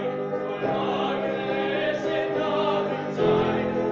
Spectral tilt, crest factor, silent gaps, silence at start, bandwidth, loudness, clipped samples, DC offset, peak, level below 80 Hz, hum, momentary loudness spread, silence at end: -7 dB/octave; 16 dB; none; 0 s; 7.2 kHz; -25 LUFS; under 0.1%; under 0.1%; -10 dBFS; -56 dBFS; none; 5 LU; 0 s